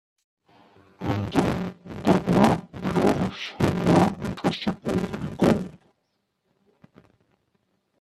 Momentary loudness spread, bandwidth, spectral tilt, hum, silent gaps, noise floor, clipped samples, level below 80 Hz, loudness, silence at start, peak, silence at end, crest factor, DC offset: 10 LU; 13.5 kHz; -7 dB/octave; none; none; -75 dBFS; under 0.1%; -50 dBFS; -24 LUFS; 1 s; -4 dBFS; 2.3 s; 22 dB; under 0.1%